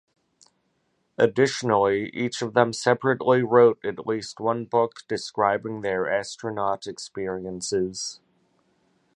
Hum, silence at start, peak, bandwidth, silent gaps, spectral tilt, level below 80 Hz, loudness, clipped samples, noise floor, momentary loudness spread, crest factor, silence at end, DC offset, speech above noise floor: none; 1.2 s; -2 dBFS; 11 kHz; none; -5 dB/octave; -62 dBFS; -24 LUFS; under 0.1%; -71 dBFS; 12 LU; 22 dB; 1.05 s; under 0.1%; 48 dB